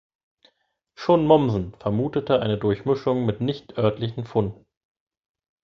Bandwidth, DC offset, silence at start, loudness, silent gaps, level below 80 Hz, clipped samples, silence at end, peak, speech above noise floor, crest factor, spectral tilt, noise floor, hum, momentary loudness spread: 7 kHz; under 0.1%; 1 s; -23 LUFS; none; -52 dBFS; under 0.1%; 1.1 s; -2 dBFS; 47 dB; 22 dB; -8.5 dB/octave; -69 dBFS; none; 10 LU